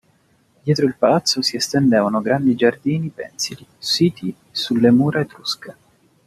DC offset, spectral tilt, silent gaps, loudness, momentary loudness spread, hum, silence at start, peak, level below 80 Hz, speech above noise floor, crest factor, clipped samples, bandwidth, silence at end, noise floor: under 0.1%; -5 dB/octave; none; -19 LUFS; 11 LU; none; 0.65 s; -2 dBFS; -58 dBFS; 41 dB; 16 dB; under 0.1%; 14.5 kHz; 0.55 s; -59 dBFS